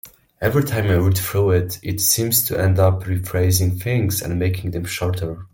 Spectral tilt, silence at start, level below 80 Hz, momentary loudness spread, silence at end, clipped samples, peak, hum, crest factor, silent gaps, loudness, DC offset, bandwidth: -5 dB/octave; 0.05 s; -44 dBFS; 7 LU; 0.05 s; under 0.1%; -2 dBFS; none; 18 dB; none; -19 LUFS; under 0.1%; 17 kHz